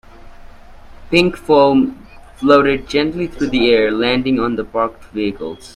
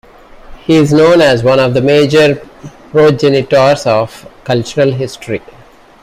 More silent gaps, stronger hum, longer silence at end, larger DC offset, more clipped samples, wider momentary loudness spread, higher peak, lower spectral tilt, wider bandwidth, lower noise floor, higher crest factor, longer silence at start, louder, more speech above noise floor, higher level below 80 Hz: neither; neither; second, 0.05 s vs 0.65 s; neither; neither; second, 10 LU vs 14 LU; about the same, 0 dBFS vs 0 dBFS; about the same, -6 dB/octave vs -6 dB/octave; second, 12 kHz vs 15 kHz; about the same, -37 dBFS vs -34 dBFS; first, 16 dB vs 10 dB; second, 0.25 s vs 0.5 s; second, -15 LUFS vs -10 LUFS; about the same, 22 dB vs 24 dB; about the same, -40 dBFS vs -42 dBFS